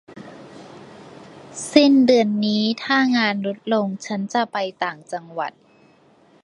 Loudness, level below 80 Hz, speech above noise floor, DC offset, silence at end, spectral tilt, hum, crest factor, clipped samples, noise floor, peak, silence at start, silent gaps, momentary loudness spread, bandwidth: -20 LUFS; -68 dBFS; 35 dB; under 0.1%; 0.95 s; -4.5 dB/octave; none; 22 dB; under 0.1%; -54 dBFS; 0 dBFS; 0.1 s; none; 26 LU; 11.5 kHz